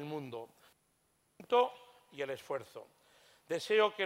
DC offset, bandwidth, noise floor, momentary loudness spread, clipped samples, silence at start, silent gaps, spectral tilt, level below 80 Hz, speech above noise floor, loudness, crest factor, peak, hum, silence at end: under 0.1%; 16 kHz; -75 dBFS; 24 LU; under 0.1%; 0 s; none; -4 dB/octave; -86 dBFS; 42 dB; -35 LUFS; 20 dB; -16 dBFS; none; 0 s